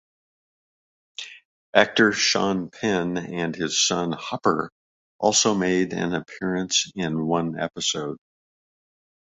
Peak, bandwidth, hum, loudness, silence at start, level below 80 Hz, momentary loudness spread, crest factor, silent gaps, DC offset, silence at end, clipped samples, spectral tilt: -2 dBFS; 8.4 kHz; none; -23 LUFS; 1.2 s; -60 dBFS; 15 LU; 24 dB; 1.45-1.73 s, 4.72-5.19 s; under 0.1%; 1.2 s; under 0.1%; -3 dB/octave